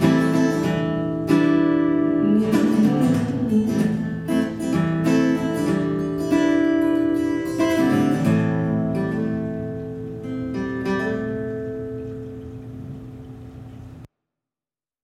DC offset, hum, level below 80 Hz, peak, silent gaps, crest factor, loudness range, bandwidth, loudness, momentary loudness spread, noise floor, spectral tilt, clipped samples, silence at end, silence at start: under 0.1%; none; -50 dBFS; -4 dBFS; none; 18 dB; 10 LU; 15.5 kHz; -21 LUFS; 17 LU; under -90 dBFS; -7.5 dB/octave; under 0.1%; 1 s; 0 s